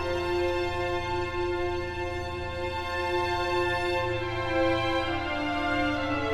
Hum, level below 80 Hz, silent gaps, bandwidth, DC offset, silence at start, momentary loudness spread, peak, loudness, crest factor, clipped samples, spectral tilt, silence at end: none; -42 dBFS; none; 13 kHz; under 0.1%; 0 s; 6 LU; -14 dBFS; -29 LUFS; 14 dB; under 0.1%; -5.5 dB/octave; 0 s